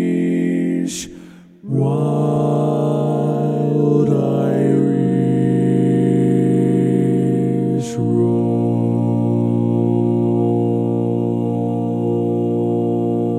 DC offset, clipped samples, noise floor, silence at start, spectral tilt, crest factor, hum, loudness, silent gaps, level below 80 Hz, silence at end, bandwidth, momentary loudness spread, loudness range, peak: under 0.1%; under 0.1%; -40 dBFS; 0 s; -8.5 dB/octave; 14 dB; none; -17 LUFS; none; -60 dBFS; 0 s; 12 kHz; 4 LU; 3 LU; -4 dBFS